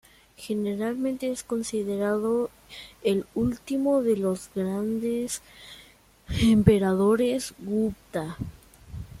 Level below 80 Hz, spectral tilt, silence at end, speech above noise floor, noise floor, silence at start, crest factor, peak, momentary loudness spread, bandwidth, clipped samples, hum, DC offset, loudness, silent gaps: -48 dBFS; -6 dB/octave; 0 s; 29 dB; -54 dBFS; 0.4 s; 22 dB; -4 dBFS; 19 LU; 15.5 kHz; under 0.1%; none; under 0.1%; -26 LUFS; none